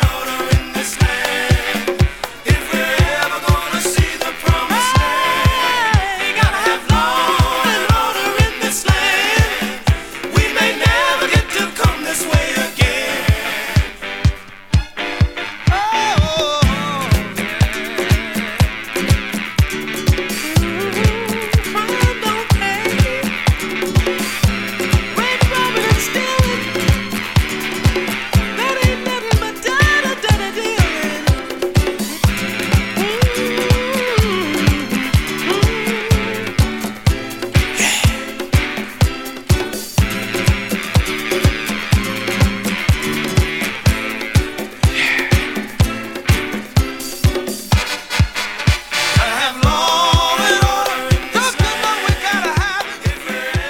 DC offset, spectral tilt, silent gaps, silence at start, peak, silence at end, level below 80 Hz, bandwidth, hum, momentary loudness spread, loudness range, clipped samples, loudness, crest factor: under 0.1%; -4.5 dB/octave; none; 0 s; 0 dBFS; 0 s; -24 dBFS; 17.5 kHz; none; 5 LU; 3 LU; under 0.1%; -16 LUFS; 16 dB